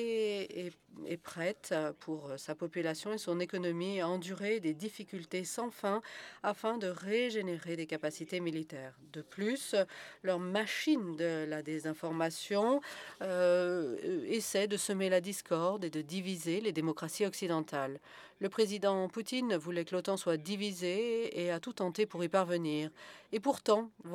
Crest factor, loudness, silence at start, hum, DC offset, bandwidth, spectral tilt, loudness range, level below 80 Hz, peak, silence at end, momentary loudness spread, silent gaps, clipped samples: 20 dB; -36 LUFS; 0 s; none; under 0.1%; 18.5 kHz; -4.5 dB/octave; 4 LU; -84 dBFS; -16 dBFS; 0 s; 10 LU; none; under 0.1%